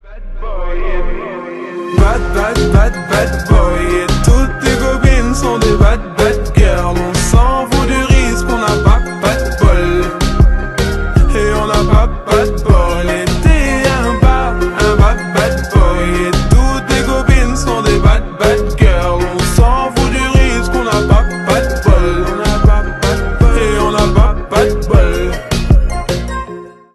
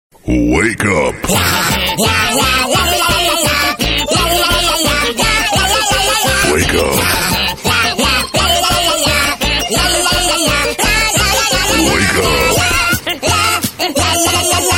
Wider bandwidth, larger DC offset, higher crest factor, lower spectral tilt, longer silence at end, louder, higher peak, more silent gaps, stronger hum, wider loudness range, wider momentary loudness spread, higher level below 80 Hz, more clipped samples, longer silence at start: second, 12.5 kHz vs 17 kHz; neither; about the same, 10 dB vs 12 dB; first, -5.5 dB/octave vs -2.5 dB/octave; first, 0.25 s vs 0 s; about the same, -13 LUFS vs -11 LUFS; about the same, 0 dBFS vs 0 dBFS; neither; neither; about the same, 1 LU vs 1 LU; first, 6 LU vs 3 LU; first, -14 dBFS vs -26 dBFS; neither; second, 0.05 s vs 0.25 s